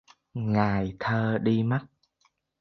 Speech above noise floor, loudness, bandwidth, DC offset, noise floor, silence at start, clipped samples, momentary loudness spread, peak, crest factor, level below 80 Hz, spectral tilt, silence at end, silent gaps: 45 dB; -27 LUFS; 6.2 kHz; under 0.1%; -71 dBFS; 0.35 s; under 0.1%; 7 LU; -8 dBFS; 20 dB; -54 dBFS; -9 dB/octave; 0.75 s; none